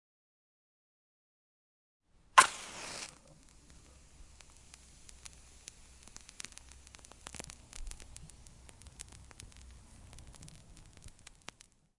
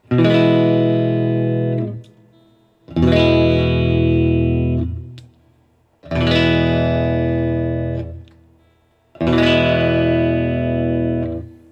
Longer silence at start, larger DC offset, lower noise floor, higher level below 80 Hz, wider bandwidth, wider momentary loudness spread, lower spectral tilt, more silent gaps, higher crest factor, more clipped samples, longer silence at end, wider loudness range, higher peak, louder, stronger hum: first, 2.35 s vs 0.1 s; neither; about the same, -60 dBFS vs -57 dBFS; second, -58 dBFS vs -36 dBFS; first, 11.5 kHz vs 7.8 kHz; first, 23 LU vs 12 LU; second, -0.5 dB/octave vs -8.5 dB/octave; neither; first, 34 dB vs 16 dB; neither; first, 0.9 s vs 0.2 s; first, 20 LU vs 2 LU; second, -6 dBFS vs 0 dBFS; second, -32 LUFS vs -17 LUFS; neither